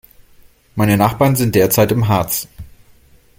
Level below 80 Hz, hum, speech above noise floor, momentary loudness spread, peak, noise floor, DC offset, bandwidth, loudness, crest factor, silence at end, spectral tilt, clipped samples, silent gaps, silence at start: -42 dBFS; none; 34 dB; 8 LU; 0 dBFS; -48 dBFS; under 0.1%; 17 kHz; -15 LUFS; 16 dB; 0.7 s; -5.5 dB/octave; under 0.1%; none; 0.75 s